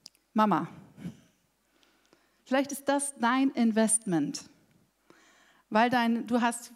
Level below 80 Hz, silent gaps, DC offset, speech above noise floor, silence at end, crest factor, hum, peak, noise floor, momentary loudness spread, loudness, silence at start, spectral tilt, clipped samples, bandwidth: -78 dBFS; none; under 0.1%; 43 dB; 0.05 s; 20 dB; none; -10 dBFS; -71 dBFS; 16 LU; -28 LUFS; 0.35 s; -4 dB/octave; under 0.1%; 15.5 kHz